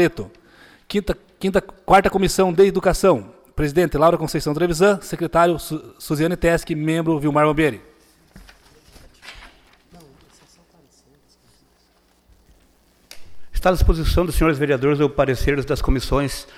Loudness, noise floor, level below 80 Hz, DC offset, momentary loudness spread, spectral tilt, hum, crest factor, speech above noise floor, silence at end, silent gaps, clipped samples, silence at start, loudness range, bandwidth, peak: -19 LUFS; -59 dBFS; -30 dBFS; under 0.1%; 11 LU; -6 dB/octave; none; 18 dB; 41 dB; 0.15 s; none; under 0.1%; 0 s; 7 LU; 16 kHz; -4 dBFS